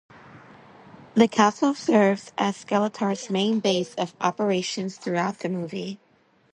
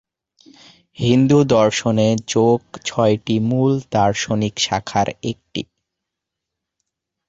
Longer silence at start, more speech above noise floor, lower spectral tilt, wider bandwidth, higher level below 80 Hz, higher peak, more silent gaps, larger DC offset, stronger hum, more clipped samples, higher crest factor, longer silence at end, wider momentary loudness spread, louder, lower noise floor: second, 0.35 s vs 1 s; second, 38 dB vs 65 dB; about the same, -5 dB/octave vs -5.5 dB/octave; first, 10.5 kHz vs 8.2 kHz; second, -70 dBFS vs -50 dBFS; about the same, -4 dBFS vs -2 dBFS; neither; neither; neither; neither; about the same, 22 dB vs 18 dB; second, 0.6 s vs 1.65 s; second, 10 LU vs 13 LU; second, -24 LUFS vs -18 LUFS; second, -62 dBFS vs -82 dBFS